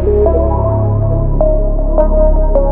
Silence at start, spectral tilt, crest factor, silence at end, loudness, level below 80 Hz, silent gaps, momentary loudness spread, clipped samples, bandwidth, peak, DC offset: 0 s; -14.5 dB/octave; 10 dB; 0 s; -13 LUFS; -12 dBFS; none; 3 LU; under 0.1%; 1.9 kHz; 0 dBFS; under 0.1%